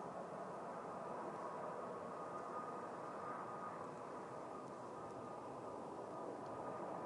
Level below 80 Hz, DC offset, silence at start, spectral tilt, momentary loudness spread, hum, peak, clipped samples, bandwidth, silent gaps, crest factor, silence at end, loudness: -86 dBFS; under 0.1%; 0 s; -6 dB/octave; 3 LU; none; -36 dBFS; under 0.1%; 11 kHz; none; 14 dB; 0 s; -49 LUFS